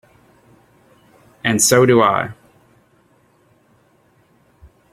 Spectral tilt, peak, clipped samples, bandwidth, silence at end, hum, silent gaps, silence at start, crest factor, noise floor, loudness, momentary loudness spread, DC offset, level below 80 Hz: -4 dB/octave; 0 dBFS; under 0.1%; 16.5 kHz; 2.6 s; none; none; 1.45 s; 20 dB; -56 dBFS; -15 LUFS; 12 LU; under 0.1%; -56 dBFS